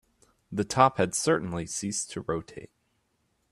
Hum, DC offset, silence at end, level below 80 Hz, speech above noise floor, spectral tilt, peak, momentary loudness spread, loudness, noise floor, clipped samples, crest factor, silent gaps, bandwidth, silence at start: none; under 0.1%; 0.85 s; -60 dBFS; 46 dB; -4 dB/octave; -6 dBFS; 14 LU; -28 LUFS; -74 dBFS; under 0.1%; 24 dB; none; 15 kHz; 0.5 s